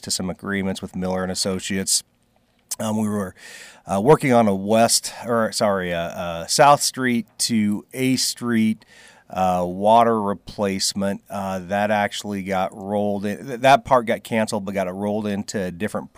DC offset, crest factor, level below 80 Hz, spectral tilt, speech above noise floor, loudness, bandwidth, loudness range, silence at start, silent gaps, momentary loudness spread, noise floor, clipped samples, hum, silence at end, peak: under 0.1%; 18 dB; -58 dBFS; -4 dB/octave; 41 dB; -21 LUFS; 16 kHz; 5 LU; 0.05 s; none; 12 LU; -62 dBFS; under 0.1%; none; 0.1 s; -4 dBFS